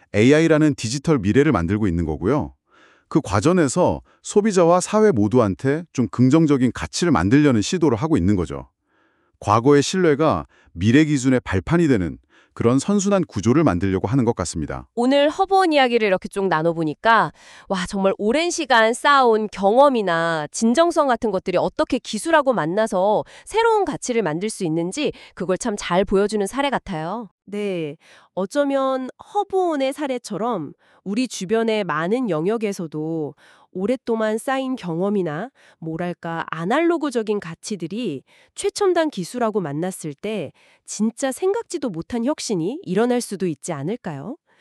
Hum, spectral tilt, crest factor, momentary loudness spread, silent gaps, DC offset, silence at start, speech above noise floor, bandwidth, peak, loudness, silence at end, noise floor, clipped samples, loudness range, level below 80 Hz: none; -5.5 dB/octave; 16 dB; 12 LU; 27.31-27.38 s; under 0.1%; 0.15 s; 44 dB; 13 kHz; -2 dBFS; -20 LUFS; 0.25 s; -63 dBFS; under 0.1%; 6 LU; -48 dBFS